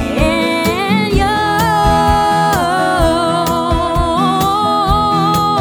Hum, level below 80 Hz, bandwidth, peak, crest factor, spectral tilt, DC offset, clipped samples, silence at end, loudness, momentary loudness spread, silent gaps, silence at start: none; -24 dBFS; over 20 kHz; 0 dBFS; 12 dB; -5 dB/octave; under 0.1%; under 0.1%; 0 s; -13 LUFS; 3 LU; none; 0 s